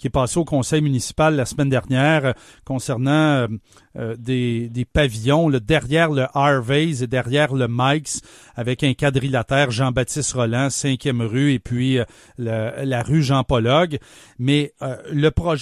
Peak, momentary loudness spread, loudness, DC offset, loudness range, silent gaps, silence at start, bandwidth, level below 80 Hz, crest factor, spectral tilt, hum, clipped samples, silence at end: -2 dBFS; 10 LU; -20 LUFS; under 0.1%; 2 LU; none; 0.05 s; 13.5 kHz; -40 dBFS; 16 dB; -5.5 dB/octave; none; under 0.1%; 0 s